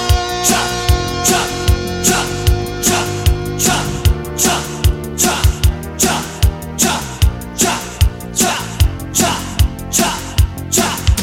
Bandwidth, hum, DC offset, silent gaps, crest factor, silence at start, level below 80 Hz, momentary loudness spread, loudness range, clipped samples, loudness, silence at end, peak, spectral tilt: 17 kHz; none; under 0.1%; none; 16 dB; 0 s; -20 dBFS; 4 LU; 1 LU; under 0.1%; -15 LUFS; 0 s; 0 dBFS; -3.5 dB/octave